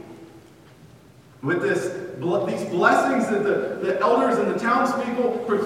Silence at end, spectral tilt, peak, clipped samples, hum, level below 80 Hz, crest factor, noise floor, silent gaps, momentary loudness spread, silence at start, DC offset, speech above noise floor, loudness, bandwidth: 0 s; -6 dB/octave; -4 dBFS; under 0.1%; none; -66 dBFS; 20 dB; -49 dBFS; none; 7 LU; 0 s; under 0.1%; 28 dB; -22 LUFS; 15.5 kHz